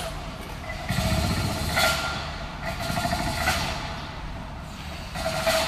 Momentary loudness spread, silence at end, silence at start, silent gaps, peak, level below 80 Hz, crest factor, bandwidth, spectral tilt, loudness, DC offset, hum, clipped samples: 13 LU; 0 s; 0 s; none; -8 dBFS; -36 dBFS; 20 dB; 15.5 kHz; -4 dB/octave; -28 LUFS; under 0.1%; none; under 0.1%